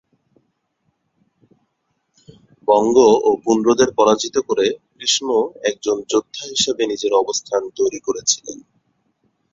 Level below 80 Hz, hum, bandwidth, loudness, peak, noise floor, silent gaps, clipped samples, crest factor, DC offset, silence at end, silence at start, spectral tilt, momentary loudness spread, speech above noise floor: -58 dBFS; none; 7.8 kHz; -18 LUFS; -2 dBFS; -70 dBFS; none; under 0.1%; 18 dB; under 0.1%; 0.95 s; 2.7 s; -2.5 dB/octave; 9 LU; 53 dB